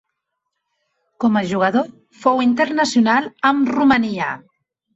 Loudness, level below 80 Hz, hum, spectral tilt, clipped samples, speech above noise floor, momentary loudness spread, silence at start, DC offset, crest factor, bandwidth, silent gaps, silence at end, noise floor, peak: -17 LUFS; -56 dBFS; none; -5 dB/octave; under 0.1%; 60 dB; 8 LU; 1.2 s; under 0.1%; 16 dB; 8.2 kHz; none; 0.6 s; -77 dBFS; -4 dBFS